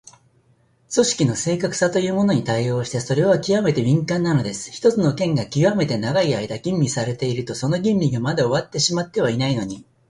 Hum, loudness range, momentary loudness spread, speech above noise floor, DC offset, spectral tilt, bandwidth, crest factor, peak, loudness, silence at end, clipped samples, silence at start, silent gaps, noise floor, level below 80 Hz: none; 2 LU; 5 LU; 40 dB; under 0.1%; -5.5 dB/octave; 11.5 kHz; 16 dB; -4 dBFS; -20 LUFS; 0.25 s; under 0.1%; 0.9 s; none; -59 dBFS; -54 dBFS